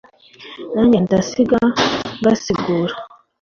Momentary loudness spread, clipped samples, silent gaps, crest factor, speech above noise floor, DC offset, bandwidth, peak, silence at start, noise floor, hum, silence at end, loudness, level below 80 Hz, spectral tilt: 13 LU; under 0.1%; none; 14 dB; 24 dB; under 0.1%; 7.2 kHz; -2 dBFS; 0.4 s; -40 dBFS; none; 0.35 s; -17 LUFS; -48 dBFS; -5.5 dB/octave